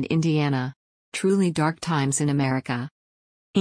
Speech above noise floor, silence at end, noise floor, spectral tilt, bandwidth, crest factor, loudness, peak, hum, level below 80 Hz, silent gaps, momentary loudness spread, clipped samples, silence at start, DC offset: over 67 dB; 0 s; under -90 dBFS; -5.5 dB/octave; 10.5 kHz; 16 dB; -24 LUFS; -8 dBFS; none; -62 dBFS; 0.76-1.12 s, 2.91-3.54 s; 10 LU; under 0.1%; 0 s; under 0.1%